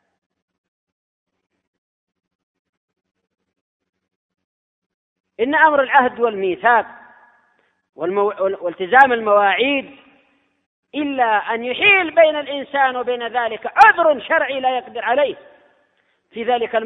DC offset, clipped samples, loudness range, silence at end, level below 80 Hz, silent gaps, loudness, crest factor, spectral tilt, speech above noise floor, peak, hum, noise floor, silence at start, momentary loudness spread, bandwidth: under 0.1%; under 0.1%; 4 LU; 0 s; -64 dBFS; 10.66-10.83 s; -16 LUFS; 20 dB; -4.5 dB/octave; 47 dB; 0 dBFS; none; -64 dBFS; 5.4 s; 12 LU; 7.8 kHz